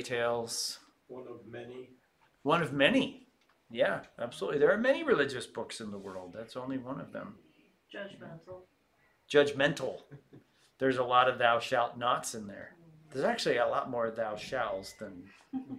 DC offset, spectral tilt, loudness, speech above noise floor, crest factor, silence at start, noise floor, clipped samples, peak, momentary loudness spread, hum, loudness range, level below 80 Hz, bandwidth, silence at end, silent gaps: under 0.1%; -4 dB/octave; -31 LUFS; 38 dB; 24 dB; 0 s; -70 dBFS; under 0.1%; -8 dBFS; 21 LU; none; 7 LU; -70 dBFS; 15 kHz; 0 s; none